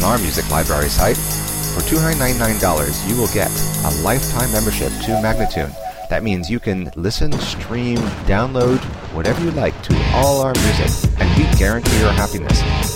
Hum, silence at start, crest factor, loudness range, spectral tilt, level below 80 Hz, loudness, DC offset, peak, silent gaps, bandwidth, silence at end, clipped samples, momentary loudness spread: none; 0 s; 16 dB; 5 LU; -4.5 dB/octave; -24 dBFS; -17 LUFS; 0.7%; -2 dBFS; none; 17 kHz; 0 s; under 0.1%; 7 LU